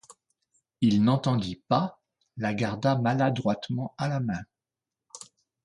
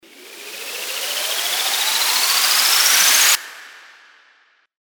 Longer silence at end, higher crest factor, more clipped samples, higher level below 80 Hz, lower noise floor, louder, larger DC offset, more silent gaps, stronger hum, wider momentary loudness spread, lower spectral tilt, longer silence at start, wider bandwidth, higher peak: second, 0.45 s vs 1.05 s; about the same, 20 dB vs 18 dB; neither; first, -60 dBFS vs -82 dBFS; first, -89 dBFS vs -57 dBFS; second, -27 LUFS vs -14 LUFS; neither; neither; neither; first, 21 LU vs 18 LU; first, -7 dB/octave vs 4 dB/octave; about the same, 0.1 s vs 0.2 s; second, 11.5 kHz vs over 20 kHz; second, -8 dBFS vs -2 dBFS